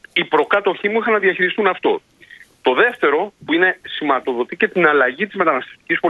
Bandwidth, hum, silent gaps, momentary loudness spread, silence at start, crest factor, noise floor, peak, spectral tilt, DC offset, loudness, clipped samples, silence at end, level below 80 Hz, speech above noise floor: 6.8 kHz; none; none; 7 LU; 0.15 s; 18 dB; -45 dBFS; 0 dBFS; -6 dB/octave; under 0.1%; -17 LUFS; under 0.1%; 0 s; -64 dBFS; 28 dB